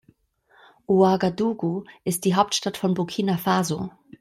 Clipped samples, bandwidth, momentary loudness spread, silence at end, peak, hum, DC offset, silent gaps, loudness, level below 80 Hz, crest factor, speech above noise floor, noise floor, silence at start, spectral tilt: under 0.1%; 14.5 kHz; 9 LU; 0.3 s; -4 dBFS; none; under 0.1%; none; -23 LUFS; -62 dBFS; 18 dB; 38 dB; -61 dBFS; 0.9 s; -5.5 dB/octave